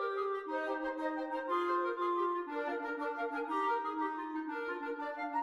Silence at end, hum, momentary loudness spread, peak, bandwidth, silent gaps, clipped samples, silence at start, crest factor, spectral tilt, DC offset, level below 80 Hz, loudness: 0 s; none; 6 LU; -24 dBFS; 11.5 kHz; none; under 0.1%; 0 s; 12 dB; -4 dB/octave; under 0.1%; -78 dBFS; -36 LUFS